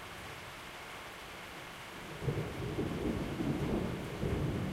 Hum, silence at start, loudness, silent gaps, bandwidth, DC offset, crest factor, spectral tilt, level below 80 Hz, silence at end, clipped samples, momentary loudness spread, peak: none; 0 s; -39 LUFS; none; 16 kHz; under 0.1%; 18 dB; -6 dB/octave; -50 dBFS; 0 s; under 0.1%; 10 LU; -20 dBFS